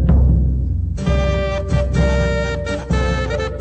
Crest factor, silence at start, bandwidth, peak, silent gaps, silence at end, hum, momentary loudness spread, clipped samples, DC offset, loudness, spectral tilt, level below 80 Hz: 12 dB; 0 s; 8.6 kHz; -4 dBFS; none; 0 s; none; 6 LU; under 0.1%; under 0.1%; -18 LUFS; -7 dB/octave; -20 dBFS